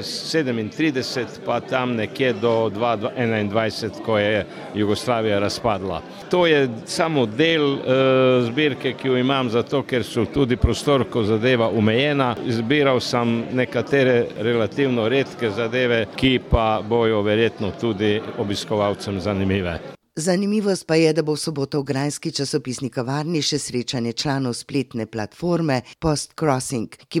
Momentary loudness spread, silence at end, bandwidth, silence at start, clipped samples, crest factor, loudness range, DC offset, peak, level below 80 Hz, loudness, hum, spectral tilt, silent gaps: 7 LU; 0 s; 15.5 kHz; 0 s; under 0.1%; 18 dB; 4 LU; under 0.1%; -4 dBFS; -40 dBFS; -21 LUFS; none; -5.5 dB/octave; none